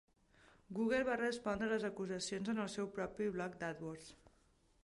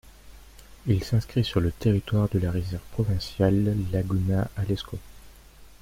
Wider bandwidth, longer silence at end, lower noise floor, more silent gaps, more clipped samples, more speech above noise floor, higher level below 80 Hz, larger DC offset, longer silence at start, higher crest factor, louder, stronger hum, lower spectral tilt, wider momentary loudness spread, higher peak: second, 11.5 kHz vs 16 kHz; first, 0.7 s vs 0.1 s; first, -72 dBFS vs -49 dBFS; neither; neither; first, 32 dB vs 24 dB; second, -70 dBFS vs -44 dBFS; neither; first, 0.7 s vs 0.25 s; about the same, 16 dB vs 18 dB; second, -40 LUFS vs -26 LUFS; neither; second, -5 dB/octave vs -7.5 dB/octave; first, 12 LU vs 8 LU; second, -24 dBFS vs -8 dBFS